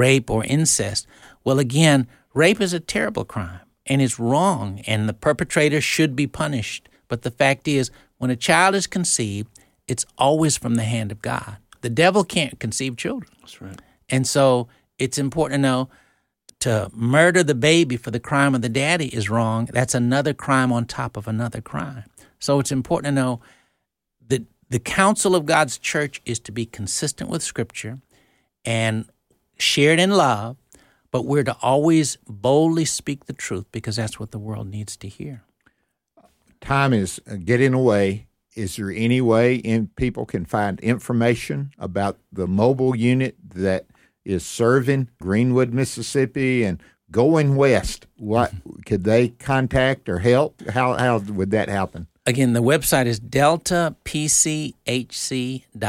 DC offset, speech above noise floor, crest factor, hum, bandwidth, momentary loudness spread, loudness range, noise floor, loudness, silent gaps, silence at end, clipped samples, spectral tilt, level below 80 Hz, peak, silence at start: under 0.1%; 55 dB; 18 dB; none; 16.5 kHz; 13 LU; 5 LU; -75 dBFS; -21 LUFS; none; 0 s; under 0.1%; -4.5 dB/octave; -48 dBFS; -2 dBFS; 0 s